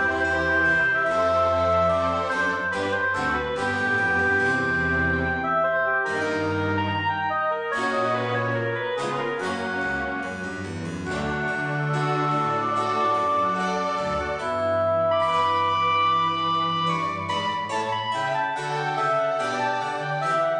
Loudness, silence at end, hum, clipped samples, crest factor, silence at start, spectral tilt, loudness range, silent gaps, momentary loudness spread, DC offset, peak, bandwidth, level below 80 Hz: -23 LUFS; 0 s; none; under 0.1%; 12 dB; 0 s; -5 dB/octave; 4 LU; none; 6 LU; under 0.1%; -10 dBFS; 10 kHz; -48 dBFS